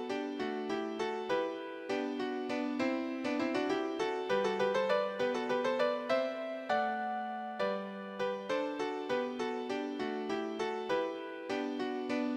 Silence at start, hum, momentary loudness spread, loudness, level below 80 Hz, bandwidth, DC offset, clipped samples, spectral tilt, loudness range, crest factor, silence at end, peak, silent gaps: 0 s; none; 6 LU; -35 LUFS; -76 dBFS; 10.5 kHz; under 0.1%; under 0.1%; -5 dB/octave; 4 LU; 18 dB; 0 s; -18 dBFS; none